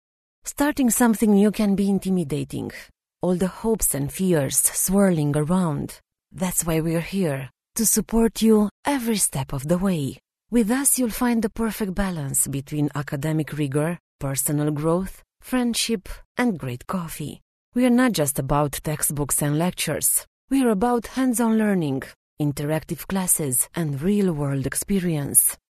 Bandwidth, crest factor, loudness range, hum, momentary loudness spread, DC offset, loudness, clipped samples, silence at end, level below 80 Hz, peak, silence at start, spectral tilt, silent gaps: 13.5 kHz; 20 dB; 3 LU; none; 11 LU; under 0.1%; -22 LUFS; under 0.1%; 0.15 s; -44 dBFS; -2 dBFS; 0.45 s; -4.5 dB/octave; 8.71-8.83 s, 14.00-14.19 s, 16.25-16.35 s, 17.42-17.72 s, 20.27-20.48 s, 22.16-22.37 s